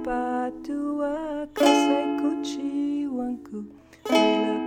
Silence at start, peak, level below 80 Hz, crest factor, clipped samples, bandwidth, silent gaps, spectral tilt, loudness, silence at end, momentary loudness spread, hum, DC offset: 0 s; -6 dBFS; -56 dBFS; 18 dB; under 0.1%; 18 kHz; none; -3.5 dB/octave; -25 LUFS; 0 s; 14 LU; none; under 0.1%